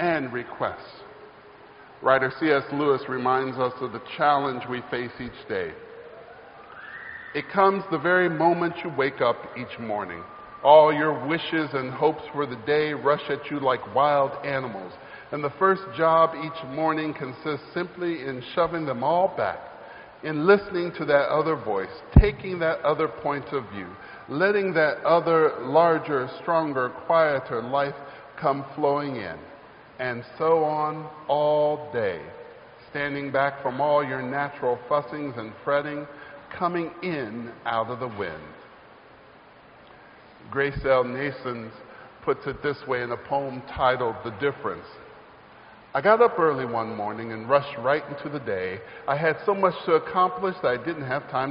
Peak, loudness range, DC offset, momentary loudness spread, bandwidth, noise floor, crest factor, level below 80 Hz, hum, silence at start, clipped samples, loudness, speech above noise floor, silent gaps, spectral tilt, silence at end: 0 dBFS; 7 LU; under 0.1%; 15 LU; 5.4 kHz; -51 dBFS; 24 dB; -42 dBFS; none; 0 s; under 0.1%; -25 LUFS; 26 dB; none; -4.5 dB/octave; 0 s